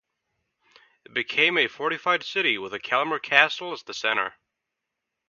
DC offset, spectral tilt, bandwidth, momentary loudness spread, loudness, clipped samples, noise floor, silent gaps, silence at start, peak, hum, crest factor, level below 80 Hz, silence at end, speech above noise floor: under 0.1%; -2.5 dB/octave; 7.2 kHz; 12 LU; -23 LUFS; under 0.1%; -83 dBFS; none; 1.15 s; 0 dBFS; none; 26 dB; -76 dBFS; 1 s; 59 dB